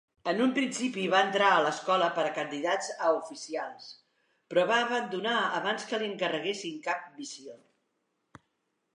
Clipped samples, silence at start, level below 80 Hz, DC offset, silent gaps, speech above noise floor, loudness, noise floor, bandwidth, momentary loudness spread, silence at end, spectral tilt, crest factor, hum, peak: under 0.1%; 0.25 s; -84 dBFS; under 0.1%; none; 50 dB; -29 LUFS; -79 dBFS; 11 kHz; 16 LU; 1.4 s; -3.5 dB/octave; 20 dB; none; -10 dBFS